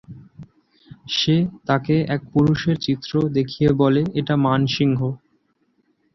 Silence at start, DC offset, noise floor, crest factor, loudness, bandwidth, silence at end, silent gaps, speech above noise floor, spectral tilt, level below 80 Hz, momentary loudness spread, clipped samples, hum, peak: 0.1 s; under 0.1%; -66 dBFS; 18 dB; -20 LUFS; 6.2 kHz; 1 s; none; 47 dB; -7 dB/octave; -50 dBFS; 6 LU; under 0.1%; none; -4 dBFS